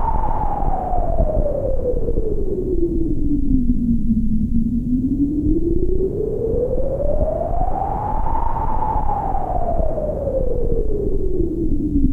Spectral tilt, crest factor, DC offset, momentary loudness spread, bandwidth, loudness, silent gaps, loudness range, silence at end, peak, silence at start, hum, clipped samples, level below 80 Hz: -11.5 dB/octave; 14 dB; under 0.1%; 3 LU; 2.2 kHz; -22 LUFS; none; 2 LU; 0 s; -2 dBFS; 0 s; none; under 0.1%; -20 dBFS